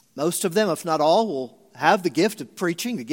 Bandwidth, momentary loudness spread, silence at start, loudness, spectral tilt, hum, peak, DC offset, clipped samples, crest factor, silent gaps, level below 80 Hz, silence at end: 17 kHz; 8 LU; 0.15 s; -22 LUFS; -4 dB/octave; none; -2 dBFS; under 0.1%; under 0.1%; 20 dB; none; -76 dBFS; 0 s